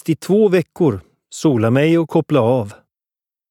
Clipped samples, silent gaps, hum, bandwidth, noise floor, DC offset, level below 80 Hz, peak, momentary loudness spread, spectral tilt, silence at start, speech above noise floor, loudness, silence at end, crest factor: under 0.1%; none; none; 15 kHz; under -90 dBFS; under 0.1%; -58 dBFS; -2 dBFS; 10 LU; -7 dB/octave; 0.05 s; over 75 dB; -16 LUFS; 0.8 s; 14 dB